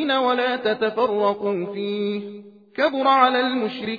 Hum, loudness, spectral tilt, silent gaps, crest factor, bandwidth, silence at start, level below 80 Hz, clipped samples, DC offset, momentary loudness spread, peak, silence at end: none; -21 LUFS; -6.5 dB/octave; none; 18 dB; 5 kHz; 0 s; -70 dBFS; under 0.1%; under 0.1%; 10 LU; -4 dBFS; 0 s